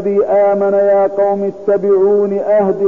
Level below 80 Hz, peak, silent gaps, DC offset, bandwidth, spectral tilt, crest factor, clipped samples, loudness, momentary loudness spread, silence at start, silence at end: -54 dBFS; -4 dBFS; none; 0.6%; 3.1 kHz; -9.5 dB/octave; 8 dB; under 0.1%; -13 LUFS; 4 LU; 0 s; 0 s